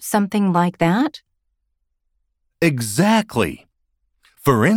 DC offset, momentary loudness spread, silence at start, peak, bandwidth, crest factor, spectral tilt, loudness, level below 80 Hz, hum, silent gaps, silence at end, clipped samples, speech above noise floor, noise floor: under 0.1%; 7 LU; 0 s; -4 dBFS; 18.5 kHz; 16 dB; -5.5 dB/octave; -19 LUFS; -52 dBFS; none; none; 0 s; under 0.1%; 55 dB; -72 dBFS